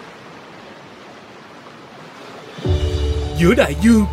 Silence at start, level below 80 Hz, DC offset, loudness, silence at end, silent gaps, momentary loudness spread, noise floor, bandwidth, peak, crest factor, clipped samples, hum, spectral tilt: 0 s; -28 dBFS; under 0.1%; -17 LUFS; 0 s; none; 24 LU; -39 dBFS; 15 kHz; -2 dBFS; 18 dB; under 0.1%; none; -6.5 dB/octave